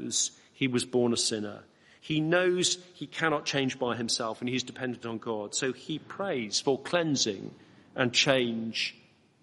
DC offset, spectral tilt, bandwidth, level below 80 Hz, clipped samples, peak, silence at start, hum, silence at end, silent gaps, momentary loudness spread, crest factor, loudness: under 0.1%; -3 dB/octave; 11.5 kHz; -70 dBFS; under 0.1%; -8 dBFS; 0 s; none; 0.5 s; none; 11 LU; 22 dB; -29 LUFS